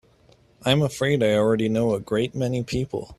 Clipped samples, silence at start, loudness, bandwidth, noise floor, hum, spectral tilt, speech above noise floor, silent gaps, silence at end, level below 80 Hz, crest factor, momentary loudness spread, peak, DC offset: under 0.1%; 0.65 s; -23 LUFS; 13.5 kHz; -57 dBFS; none; -6 dB/octave; 34 dB; none; 0.05 s; -50 dBFS; 18 dB; 7 LU; -4 dBFS; under 0.1%